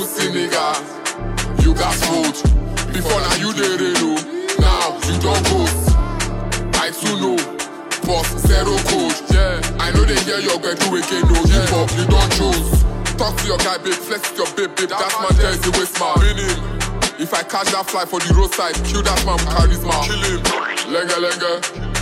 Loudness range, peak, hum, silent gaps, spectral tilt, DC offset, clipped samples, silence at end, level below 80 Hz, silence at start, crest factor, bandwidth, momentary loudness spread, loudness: 2 LU; -2 dBFS; none; none; -4 dB/octave; under 0.1%; under 0.1%; 0 s; -20 dBFS; 0 s; 14 dB; 16.5 kHz; 6 LU; -17 LUFS